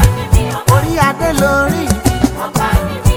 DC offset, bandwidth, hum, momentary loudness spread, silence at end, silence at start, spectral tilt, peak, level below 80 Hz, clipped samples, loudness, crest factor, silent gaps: under 0.1%; over 20 kHz; none; 3 LU; 0 s; 0 s; -5.5 dB/octave; 0 dBFS; -20 dBFS; 0.3%; -13 LUFS; 12 dB; none